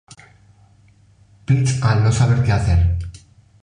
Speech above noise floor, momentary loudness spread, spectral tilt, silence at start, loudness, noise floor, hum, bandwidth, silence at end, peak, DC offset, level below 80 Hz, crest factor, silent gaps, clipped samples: 37 dB; 12 LU; -6.5 dB/octave; 1.5 s; -17 LUFS; -52 dBFS; none; 10 kHz; 0.45 s; -4 dBFS; under 0.1%; -28 dBFS; 14 dB; none; under 0.1%